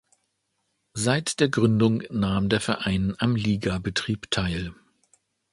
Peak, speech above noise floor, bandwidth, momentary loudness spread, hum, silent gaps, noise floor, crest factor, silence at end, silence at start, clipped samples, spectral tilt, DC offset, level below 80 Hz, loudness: -6 dBFS; 51 dB; 11.5 kHz; 7 LU; none; none; -75 dBFS; 20 dB; 0.8 s; 0.95 s; under 0.1%; -5 dB/octave; under 0.1%; -46 dBFS; -25 LUFS